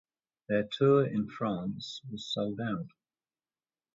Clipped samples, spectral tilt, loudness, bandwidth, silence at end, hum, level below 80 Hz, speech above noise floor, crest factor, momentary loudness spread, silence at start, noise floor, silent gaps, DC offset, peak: under 0.1%; -7 dB/octave; -31 LUFS; 7.8 kHz; 1.05 s; none; -68 dBFS; over 59 dB; 20 dB; 15 LU; 0.5 s; under -90 dBFS; none; under 0.1%; -12 dBFS